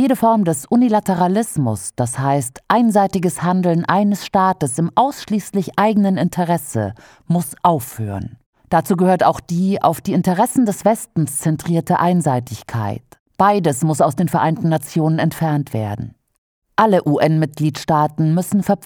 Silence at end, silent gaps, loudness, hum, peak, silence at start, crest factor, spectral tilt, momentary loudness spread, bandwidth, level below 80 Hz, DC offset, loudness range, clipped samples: 0 s; 8.46-8.53 s, 13.20-13.26 s, 16.38-16.62 s; -17 LUFS; none; 0 dBFS; 0 s; 16 dB; -6.5 dB/octave; 9 LU; over 20 kHz; -52 dBFS; under 0.1%; 2 LU; under 0.1%